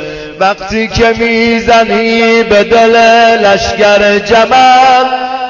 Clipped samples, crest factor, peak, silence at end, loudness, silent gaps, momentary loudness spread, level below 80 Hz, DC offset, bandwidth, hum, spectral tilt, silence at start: 0.4%; 8 dB; 0 dBFS; 0 s; -7 LUFS; none; 8 LU; -32 dBFS; under 0.1%; 7.4 kHz; none; -4 dB/octave; 0 s